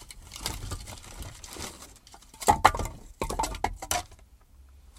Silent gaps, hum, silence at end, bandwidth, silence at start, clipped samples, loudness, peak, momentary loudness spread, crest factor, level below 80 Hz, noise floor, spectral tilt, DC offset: none; none; 0 s; 16.5 kHz; 0 s; under 0.1%; -30 LUFS; -2 dBFS; 24 LU; 30 dB; -42 dBFS; -54 dBFS; -3 dB/octave; under 0.1%